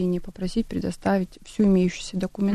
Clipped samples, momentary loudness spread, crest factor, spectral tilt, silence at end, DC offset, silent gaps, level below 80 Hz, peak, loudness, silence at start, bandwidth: under 0.1%; 9 LU; 12 dB; -7 dB/octave; 0 s; under 0.1%; none; -42 dBFS; -12 dBFS; -25 LUFS; 0 s; 12 kHz